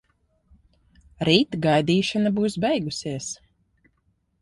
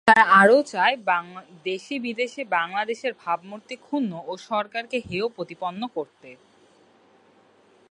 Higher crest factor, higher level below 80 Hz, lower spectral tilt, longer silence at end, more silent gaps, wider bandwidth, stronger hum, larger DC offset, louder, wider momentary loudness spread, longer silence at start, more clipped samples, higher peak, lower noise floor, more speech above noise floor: about the same, 22 dB vs 22 dB; first, -56 dBFS vs -66 dBFS; about the same, -5 dB/octave vs -4.5 dB/octave; second, 1.05 s vs 1.6 s; neither; about the same, 11.5 kHz vs 11.5 kHz; neither; neither; about the same, -23 LUFS vs -23 LUFS; second, 12 LU vs 19 LU; first, 1.2 s vs 0.05 s; neither; about the same, -4 dBFS vs -2 dBFS; first, -69 dBFS vs -58 dBFS; first, 47 dB vs 34 dB